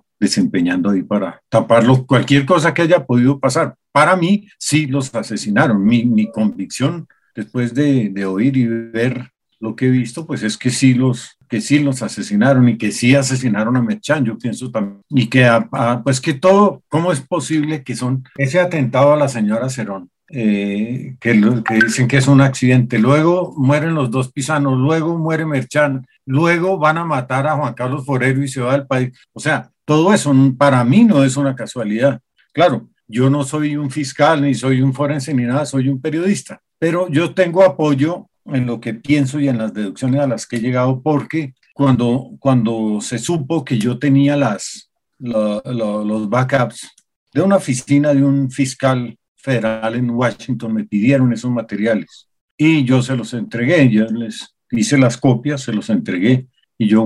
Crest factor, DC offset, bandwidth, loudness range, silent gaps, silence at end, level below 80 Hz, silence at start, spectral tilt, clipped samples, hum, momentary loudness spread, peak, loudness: 14 dB; under 0.1%; 12 kHz; 4 LU; 47.16-47.27 s, 49.28-49.35 s, 52.41-52.58 s; 0 s; -58 dBFS; 0.2 s; -6 dB/octave; under 0.1%; none; 10 LU; 0 dBFS; -16 LUFS